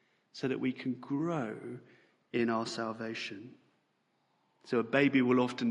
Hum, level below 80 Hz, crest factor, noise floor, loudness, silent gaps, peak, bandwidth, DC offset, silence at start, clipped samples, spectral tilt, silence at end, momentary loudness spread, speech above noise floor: none; -78 dBFS; 22 dB; -76 dBFS; -33 LUFS; none; -12 dBFS; 10.5 kHz; under 0.1%; 0.35 s; under 0.1%; -6 dB/octave; 0 s; 17 LU; 44 dB